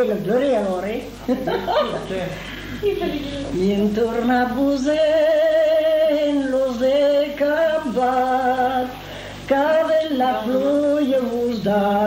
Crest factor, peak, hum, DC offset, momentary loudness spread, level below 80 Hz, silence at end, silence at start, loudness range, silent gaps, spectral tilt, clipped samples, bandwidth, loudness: 14 dB; -6 dBFS; none; under 0.1%; 10 LU; -44 dBFS; 0 s; 0 s; 5 LU; none; -6 dB/octave; under 0.1%; 16 kHz; -19 LUFS